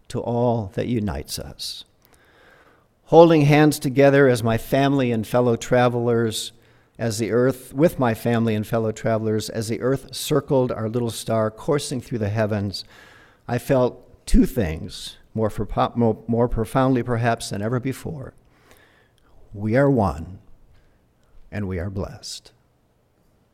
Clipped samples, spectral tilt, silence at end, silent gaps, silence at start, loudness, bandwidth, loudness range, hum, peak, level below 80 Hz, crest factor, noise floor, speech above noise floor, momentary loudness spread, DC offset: under 0.1%; -6 dB/octave; 1.15 s; none; 0.1 s; -21 LUFS; 16.5 kHz; 8 LU; none; 0 dBFS; -38 dBFS; 22 dB; -62 dBFS; 42 dB; 15 LU; under 0.1%